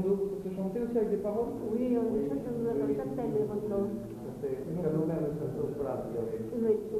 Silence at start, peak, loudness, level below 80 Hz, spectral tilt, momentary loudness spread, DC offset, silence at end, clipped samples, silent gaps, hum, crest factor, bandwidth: 0 s; -18 dBFS; -33 LUFS; -56 dBFS; -9 dB/octave; 5 LU; under 0.1%; 0 s; under 0.1%; none; none; 14 dB; 14 kHz